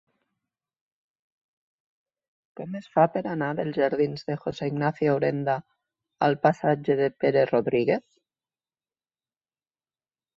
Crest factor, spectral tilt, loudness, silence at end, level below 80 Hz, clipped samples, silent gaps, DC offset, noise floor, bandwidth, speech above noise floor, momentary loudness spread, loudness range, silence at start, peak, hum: 20 dB; -8 dB/octave; -25 LUFS; 2.35 s; -68 dBFS; under 0.1%; none; under 0.1%; under -90 dBFS; 7.4 kHz; over 66 dB; 8 LU; 5 LU; 2.6 s; -6 dBFS; none